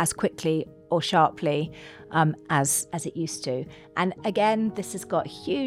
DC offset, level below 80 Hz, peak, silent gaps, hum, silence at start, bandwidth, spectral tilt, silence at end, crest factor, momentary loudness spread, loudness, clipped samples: under 0.1%; -62 dBFS; -6 dBFS; none; none; 0 s; 16.5 kHz; -4.5 dB/octave; 0 s; 20 dB; 9 LU; -26 LUFS; under 0.1%